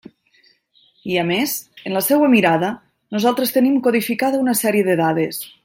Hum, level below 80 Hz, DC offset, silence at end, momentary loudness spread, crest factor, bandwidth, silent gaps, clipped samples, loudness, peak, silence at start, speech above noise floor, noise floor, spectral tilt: none; -64 dBFS; under 0.1%; 0.15 s; 11 LU; 16 dB; 16.5 kHz; none; under 0.1%; -18 LUFS; -2 dBFS; 1.05 s; 40 dB; -57 dBFS; -4.5 dB/octave